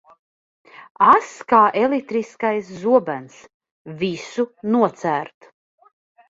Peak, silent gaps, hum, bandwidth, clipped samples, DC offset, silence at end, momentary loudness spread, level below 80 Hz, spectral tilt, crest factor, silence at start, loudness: -2 dBFS; 3.54-3.60 s, 3.71-3.85 s; none; 8 kHz; under 0.1%; under 0.1%; 1.05 s; 12 LU; -64 dBFS; -6 dB/octave; 20 dB; 1 s; -19 LUFS